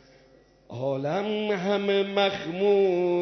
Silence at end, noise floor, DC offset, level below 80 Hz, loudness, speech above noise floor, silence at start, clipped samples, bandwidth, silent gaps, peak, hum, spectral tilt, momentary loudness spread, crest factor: 0 s; -57 dBFS; under 0.1%; -66 dBFS; -25 LUFS; 33 dB; 0.7 s; under 0.1%; 6.4 kHz; none; -12 dBFS; none; -6.5 dB/octave; 8 LU; 14 dB